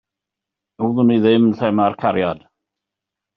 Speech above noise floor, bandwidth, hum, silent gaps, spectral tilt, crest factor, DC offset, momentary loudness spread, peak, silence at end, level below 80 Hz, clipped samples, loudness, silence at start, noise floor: 69 dB; 5.2 kHz; none; none; -6 dB/octave; 16 dB; under 0.1%; 10 LU; -2 dBFS; 1 s; -60 dBFS; under 0.1%; -17 LUFS; 0.8 s; -84 dBFS